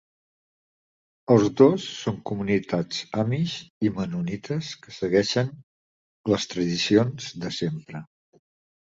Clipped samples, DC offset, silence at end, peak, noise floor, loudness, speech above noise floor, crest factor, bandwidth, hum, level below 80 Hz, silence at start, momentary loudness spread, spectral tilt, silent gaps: under 0.1%; under 0.1%; 0.9 s; -4 dBFS; under -90 dBFS; -25 LUFS; over 66 dB; 22 dB; 7.8 kHz; none; -58 dBFS; 1.3 s; 13 LU; -6 dB/octave; 3.70-3.81 s, 5.63-6.24 s